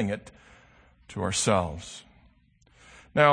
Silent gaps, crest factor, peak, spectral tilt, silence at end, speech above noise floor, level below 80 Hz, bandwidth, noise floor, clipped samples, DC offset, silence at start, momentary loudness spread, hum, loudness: none; 26 dB; -4 dBFS; -4 dB/octave; 0 s; 33 dB; -54 dBFS; 9.8 kHz; -62 dBFS; under 0.1%; under 0.1%; 0 s; 18 LU; none; -27 LUFS